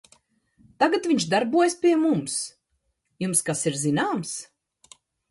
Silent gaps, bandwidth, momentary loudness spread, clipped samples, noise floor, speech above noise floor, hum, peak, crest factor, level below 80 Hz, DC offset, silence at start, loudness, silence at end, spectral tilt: none; 12 kHz; 11 LU; under 0.1%; -74 dBFS; 51 dB; none; -6 dBFS; 18 dB; -68 dBFS; under 0.1%; 0.8 s; -23 LUFS; 0.85 s; -4 dB/octave